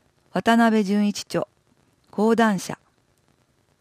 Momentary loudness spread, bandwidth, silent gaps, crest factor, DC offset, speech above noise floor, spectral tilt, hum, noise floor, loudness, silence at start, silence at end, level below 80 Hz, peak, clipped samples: 16 LU; 15 kHz; none; 16 dB; under 0.1%; 44 dB; -5.5 dB/octave; none; -64 dBFS; -21 LUFS; 0.35 s; 1.05 s; -66 dBFS; -6 dBFS; under 0.1%